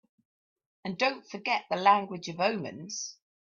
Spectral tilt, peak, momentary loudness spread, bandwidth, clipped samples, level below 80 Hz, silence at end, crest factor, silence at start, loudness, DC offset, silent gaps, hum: -3.5 dB/octave; -10 dBFS; 14 LU; 7.4 kHz; under 0.1%; -76 dBFS; 0.4 s; 22 dB; 0.85 s; -29 LUFS; under 0.1%; none; none